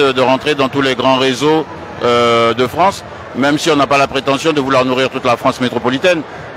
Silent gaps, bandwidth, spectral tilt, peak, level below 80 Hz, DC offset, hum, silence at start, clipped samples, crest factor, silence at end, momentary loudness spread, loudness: none; 15.5 kHz; -4.5 dB/octave; 0 dBFS; -46 dBFS; under 0.1%; none; 0 s; under 0.1%; 14 dB; 0 s; 5 LU; -13 LUFS